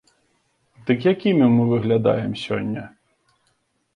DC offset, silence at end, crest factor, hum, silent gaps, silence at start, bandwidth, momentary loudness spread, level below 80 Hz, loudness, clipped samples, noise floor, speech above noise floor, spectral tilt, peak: under 0.1%; 1.1 s; 16 dB; none; none; 0.85 s; 9.8 kHz; 12 LU; -58 dBFS; -20 LUFS; under 0.1%; -68 dBFS; 49 dB; -8.5 dB/octave; -6 dBFS